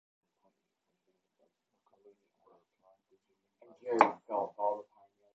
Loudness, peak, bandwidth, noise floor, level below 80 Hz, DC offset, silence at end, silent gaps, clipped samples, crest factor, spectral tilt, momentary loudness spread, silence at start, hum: -32 LUFS; -6 dBFS; 8 kHz; -84 dBFS; -86 dBFS; under 0.1%; 0.5 s; none; under 0.1%; 32 dB; -3 dB/octave; 14 LU; 3.85 s; none